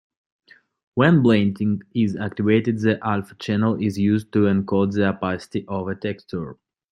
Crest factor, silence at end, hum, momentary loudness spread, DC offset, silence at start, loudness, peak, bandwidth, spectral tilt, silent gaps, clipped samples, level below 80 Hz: 18 dB; 0.4 s; none; 11 LU; under 0.1%; 0.95 s; -21 LUFS; -2 dBFS; 11 kHz; -8 dB/octave; none; under 0.1%; -60 dBFS